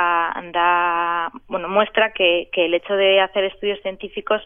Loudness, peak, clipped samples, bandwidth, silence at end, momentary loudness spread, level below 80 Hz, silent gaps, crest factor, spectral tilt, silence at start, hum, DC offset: -19 LUFS; -2 dBFS; under 0.1%; 3.7 kHz; 0 s; 10 LU; -52 dBFS; none; 16 dB; -7.5 dB/octave; 0 s; none; under 0.1%